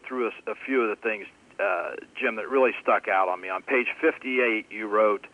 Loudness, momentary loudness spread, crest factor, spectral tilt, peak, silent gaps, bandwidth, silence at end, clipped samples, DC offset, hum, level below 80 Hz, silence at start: -26 LUFS; 8 LU; 16 dB; -5 dB/octave; -10 dBFS; none; 10.5 kHz; 0.05 s; under 0.1%; under 0.1%; none; -74 dBFS; 0.05 s